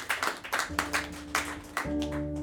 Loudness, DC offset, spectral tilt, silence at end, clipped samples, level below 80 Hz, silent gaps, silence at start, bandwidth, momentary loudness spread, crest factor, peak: -32 LUFS; under 0.1%; -3 dB/octave; 0 s; under 0.1%; -46 dBFS; none; 0 s; over 20 kHz; 4 LU; 22 dB; -10 dBFS